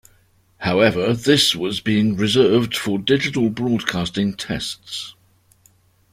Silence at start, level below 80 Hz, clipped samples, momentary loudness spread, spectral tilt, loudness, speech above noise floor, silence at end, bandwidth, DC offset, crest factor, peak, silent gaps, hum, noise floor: 0.6 s; -50 dBFS; under 0.1%; 12 LU; -4.5 dB/octave; -19 LUFS; 38 dB; 1 s; 16 kHz; under 0.1%; 20 dB; 0 dBFS; none; none; -57 dBFS